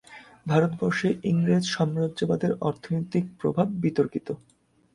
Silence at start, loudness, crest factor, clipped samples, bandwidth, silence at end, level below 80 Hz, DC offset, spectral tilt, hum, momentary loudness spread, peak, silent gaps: 0.1 s; -26 LUFS; 18 dB; under 0.1%; 11 kHz; 0.6 s; -60 dBFS; under 0.1%; -7 dB/octave; none; 7 LU; -8 dBFS; none